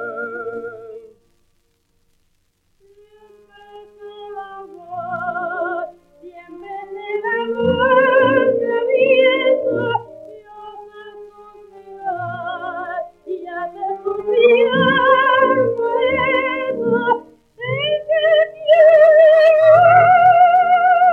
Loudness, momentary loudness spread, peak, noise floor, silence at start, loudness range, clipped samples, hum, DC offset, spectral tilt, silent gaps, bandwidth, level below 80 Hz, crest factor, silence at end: -15 LUFS; 22 LU; -2 dBFS; -63 dBFS; 0 s; 17 LU; under 0.1%; none; under 0.1%; -6.5 dB/octave; none; 4.6 kHz; -56 dBFS; 16 dB; 0 s